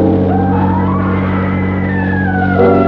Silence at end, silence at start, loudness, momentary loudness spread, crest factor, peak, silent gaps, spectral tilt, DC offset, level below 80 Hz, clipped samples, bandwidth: 0 s; 0 s; -13 LUFS; 4 LU; 12 dB; 0 dBFS; none; -8 dB/octave; under 0.1%; -34 dBFS; under 0.1%; 4.7 kHz